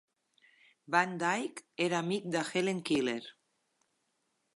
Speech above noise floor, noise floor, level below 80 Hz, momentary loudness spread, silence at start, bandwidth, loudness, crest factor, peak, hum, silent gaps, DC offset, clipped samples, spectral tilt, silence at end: 47 dB; -79 dBFS; -80 dBFS; 8 LU; 0.9 s; 11.5 kHz; -33 LUFS; 22 dB; -14 dBFS; none; none; under 0.1%; under 0.1%; -4.5 dB/octave; 1.25 s